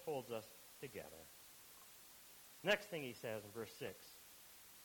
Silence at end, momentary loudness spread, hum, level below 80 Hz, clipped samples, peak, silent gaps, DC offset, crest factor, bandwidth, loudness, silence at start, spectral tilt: 0 s; 19 LU; none; -80 dBFS; under 0.1%; -22 dBFS; none; under 0.1%; 26 dB; 19 kHz; -47 LUFS; 0 s; -3.5 dB/octave